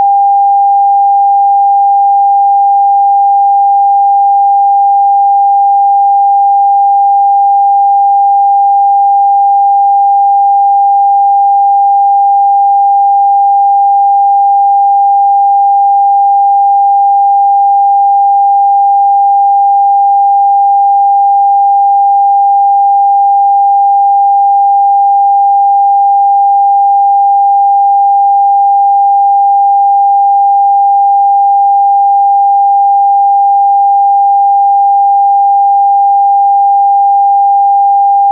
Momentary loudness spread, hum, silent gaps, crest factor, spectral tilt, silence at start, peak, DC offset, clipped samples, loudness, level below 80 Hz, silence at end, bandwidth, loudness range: 0 LU; none; none; 4 dB; 4.5 dB/octave; 0 s; -4 dBFS; under 0.1%; under 0.1%; -7 LUFS; under -90 dBFS; 0 s; 1 kHz; 0 LU